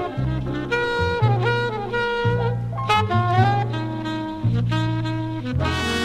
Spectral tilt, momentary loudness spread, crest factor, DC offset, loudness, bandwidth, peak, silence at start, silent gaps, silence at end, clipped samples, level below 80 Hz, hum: -6.5 dB/octave; 7 LU; 18 dB; under 0.1%; -22 LUFS; 10.5 kHz; -4 dBFS; 0 s; none; 0 s; under 0.1%; -38 dBFS; none